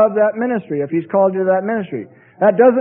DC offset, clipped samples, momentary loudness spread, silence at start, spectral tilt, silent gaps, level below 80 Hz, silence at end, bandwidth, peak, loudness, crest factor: under 0.1%; under 0.1%; 10 LU; 0 s; -13 dB/octave; none; -64 dBFS; 0 s; 3.5 kHz; 0 dBFS; -16 LUFS; 16 dB